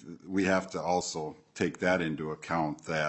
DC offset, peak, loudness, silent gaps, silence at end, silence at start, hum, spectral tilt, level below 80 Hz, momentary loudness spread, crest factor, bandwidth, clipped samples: under 0.1%; -12 dBFS; -31 LUFS; none; 0 s; 0 s; none; -5 dB/octave; -66 dBFS; 8 LU; 20 dB; 8.6 kHz; under 0.1%